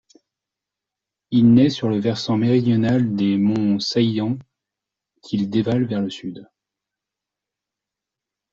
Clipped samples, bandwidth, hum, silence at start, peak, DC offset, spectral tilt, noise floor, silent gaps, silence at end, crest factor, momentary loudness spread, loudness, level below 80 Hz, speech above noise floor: under 0.1%; 7.6 kHz; 50 Hz at -40 dBFS; 1.3 s; -4 dBFS; under 0.1%; -7.5 dB/octave; -86 dBFS; none; 2.1 s; 18 dB; 12 LU; -19 LUFS; -56 dBFS; 68 dB